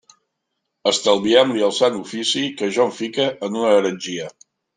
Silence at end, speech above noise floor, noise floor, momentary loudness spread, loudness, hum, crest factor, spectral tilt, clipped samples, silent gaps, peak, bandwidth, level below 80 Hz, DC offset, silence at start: 0.45 s; 58 dB; -77 dBFS; 10 LU; -19 LUFS; none; 18 dB; -3.5 dB/octave; under 0.1%; none; -2 dBFS; 9.6 kHz; -66 dBFS; under 0.1%; 0.85 s